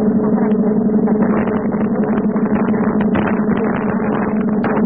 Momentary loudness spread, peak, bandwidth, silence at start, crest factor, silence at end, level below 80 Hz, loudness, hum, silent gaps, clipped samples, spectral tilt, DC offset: 3 LU; -4 dBFS; 3.4 kHz; 0 s; 12 dB; 0 s; -42 dBFS; -16 LUFS; none; none; under 0.1%; -14 dB/octave; 0.5%